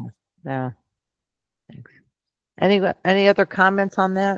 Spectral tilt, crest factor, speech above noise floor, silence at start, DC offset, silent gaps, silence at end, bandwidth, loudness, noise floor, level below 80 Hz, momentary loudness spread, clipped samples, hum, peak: -6.5 dB/octave; 20 dB; 67 dB; 0 s; under 0.1%; none; 0 s; 7.4 kHz; -19 LUFS; -86 dBFS; -64 dBFS; 15 LU; under 0.1%; none; -2 dBFS